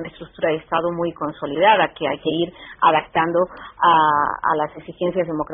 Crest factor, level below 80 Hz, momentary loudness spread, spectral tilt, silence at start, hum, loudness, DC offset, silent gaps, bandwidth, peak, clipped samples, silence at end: 18 dB; -54 dBFS; 10 LU; -3 dB/octave; 0 s; none; -20 LUFS; under 0.1%; none; 3.9 kHz; -2 dBFS; under 0.1%; 0 s